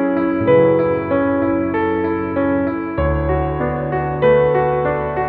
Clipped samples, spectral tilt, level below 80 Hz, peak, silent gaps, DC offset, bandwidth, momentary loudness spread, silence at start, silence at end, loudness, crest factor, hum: under 0.1%; -11.5 dB/octave; -32 dBFS; -2 dBFS; none; under 0.1%; 4.4 kHz; 7 LU; 0 s; 0 s; -17 LUFS; 14 dB; none